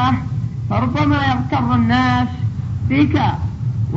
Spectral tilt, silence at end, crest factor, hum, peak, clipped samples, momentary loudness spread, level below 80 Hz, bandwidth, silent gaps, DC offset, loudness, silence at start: -8 dB/octave; 0 s; 14 dB; none; -2 dBFS; under 0.1%; 8 LU; -34 dBFS; 7.4 kHz; none; under 0.1%; -18 LUFS; 0 s